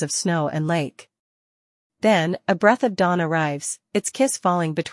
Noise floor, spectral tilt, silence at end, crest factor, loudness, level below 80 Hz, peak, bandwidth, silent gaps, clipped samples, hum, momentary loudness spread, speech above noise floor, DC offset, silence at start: under -90 dBFS; -4.5 dB/octave; 0 s; 20 dB; -21 LUFS; -68 dBFS; -2 dBFS; 12 kHz; 1.19-1.90 s; under 0.1%; none; 7 LU; over 69 dB; under 0.1%; 0 s